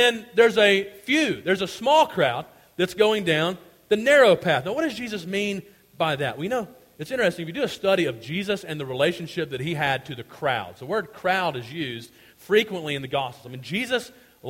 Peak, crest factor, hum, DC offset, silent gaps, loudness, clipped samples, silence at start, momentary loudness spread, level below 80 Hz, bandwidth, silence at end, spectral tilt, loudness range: -6 dBFS; 18 dB; none; under 0.1%; none; -23 LUFS; under 0.1%; 0 s; 13 LU; -62 dBFS; 16.5 kHz; 0 s; -4.5 dB/octave; 6 LU